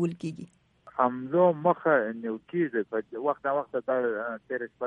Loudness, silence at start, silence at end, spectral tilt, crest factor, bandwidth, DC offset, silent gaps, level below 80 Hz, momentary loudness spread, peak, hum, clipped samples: -28 LUFS; 0 s; 0 s; -8.5 dB/octave; 20 dB; 9.4 kHz; under 0.1%; none; -74 dBFS; 12 LU; -8 dBFS; none; under 0.1%